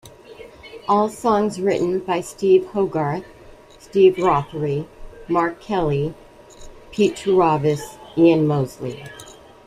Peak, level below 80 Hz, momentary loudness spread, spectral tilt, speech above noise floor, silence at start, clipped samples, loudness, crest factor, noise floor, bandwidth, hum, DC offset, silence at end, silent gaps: -4 dBFS; -48 dBFS; 16 LU; -7 dB/octave; 26 dB; 0.05 s; under 0.1%; -20 LUFS; 16 dB; -45 dBFS; 14 kHz; none; under 0.1%; 0.35 s; none